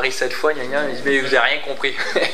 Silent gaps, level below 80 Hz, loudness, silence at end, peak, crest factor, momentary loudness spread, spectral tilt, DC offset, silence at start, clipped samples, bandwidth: none; -70 dBFS; -19 LUFS; 0 s; -2 dBFS; 18 dB; 6 LU; -2.5 dB/octave; 5%; 0 s; under 0.1%; 15 kHz